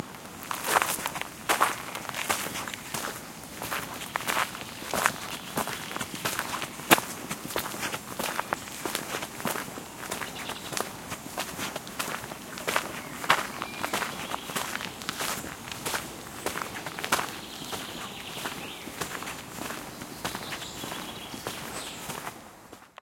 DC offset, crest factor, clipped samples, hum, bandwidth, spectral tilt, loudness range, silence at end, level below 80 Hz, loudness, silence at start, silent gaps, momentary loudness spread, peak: under 0.1%; 32 dB; under 0.1%; none; 17 kHz; -2 dB/octave; 7 LU; 0.1 s; -60 dBFS; -31 LUFS; 0 s; none; 11 LU; 0 dBFS